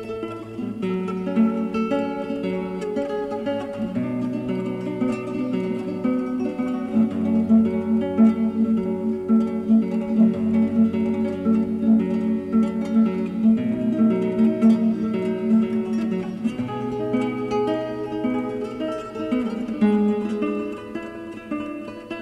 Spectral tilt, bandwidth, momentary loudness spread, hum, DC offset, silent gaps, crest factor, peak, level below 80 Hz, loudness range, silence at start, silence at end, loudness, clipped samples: -8.5 dB/octave; 7.6 kHz; 10 LU; none; under 0.1%; none; 16 dB; -6 dBFS; -56 dBFS; 5 LU; 0 s; 0 s; -23 LUFS; under 0.1%